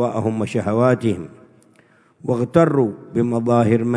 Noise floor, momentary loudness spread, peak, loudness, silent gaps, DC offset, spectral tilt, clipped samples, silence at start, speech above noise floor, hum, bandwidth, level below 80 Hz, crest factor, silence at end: -54 dBFS; 9 LU; 0 dBFS; -19 LUFS; none; under 0.1%; -8 dB/octave; under 0.1%; 0 s; 36 dB; none; 11 kHz; -56 dBFS; 18 dB; 0 s